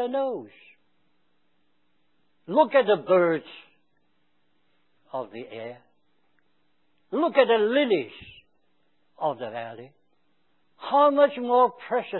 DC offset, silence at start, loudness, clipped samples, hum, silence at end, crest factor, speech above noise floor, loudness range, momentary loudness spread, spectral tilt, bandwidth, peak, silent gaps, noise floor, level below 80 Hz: under 0.1%; 0 s; -23 LUFS; under 0.1%; none; 0 s; 22 dB; 49 dB; 12 LU; 18 LU; -9 dB/octave; 4.2 kHz; -4 dBFS; none; -73 dBFS; -72 dBFS